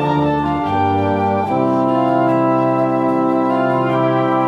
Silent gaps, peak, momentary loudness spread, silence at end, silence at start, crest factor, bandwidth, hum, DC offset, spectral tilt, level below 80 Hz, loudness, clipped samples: none; -2 dBFS; 2 LU; 0 s; 0 s; 12 dB; 7.8 kHz; none; under 0.1%; -8.5 dB/octave; -48 dBFS; -16 LUFS; under 0.1%